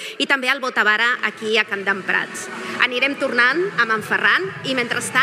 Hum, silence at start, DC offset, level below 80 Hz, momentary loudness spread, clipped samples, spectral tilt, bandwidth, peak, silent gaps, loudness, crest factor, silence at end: none; 0 s; under 0.1%; -74 dBFS; 6 LU; under 0.1%; -2.5 dB/octave; 16 kHz; 0 dBFS; none; -18 LUFS; 20 dB; 0 s